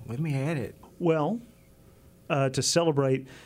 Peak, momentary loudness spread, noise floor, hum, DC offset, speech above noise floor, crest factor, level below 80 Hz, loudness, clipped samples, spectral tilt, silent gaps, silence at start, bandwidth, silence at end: -10 dBFS; 9 LU; -55 dBFS; none; under 0.1%; 28 dB; 18 dB; -62 dBFS; -27 LUFS; under 0.1%; -5 dB/octave; none; 0 s; 16 kHz; 0.05 s